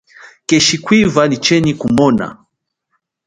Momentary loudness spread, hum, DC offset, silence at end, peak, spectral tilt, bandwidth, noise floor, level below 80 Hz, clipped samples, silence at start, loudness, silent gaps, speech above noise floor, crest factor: 7 LU; none; under 0.1%; 0.95 s; 0 dBFS; -4.5 dB/octave; 11 kHz; -70 dBFS; -46 dBFS; under 0.1%; 0.25 s; -12 LUFS; none; 58 dB; 14 dB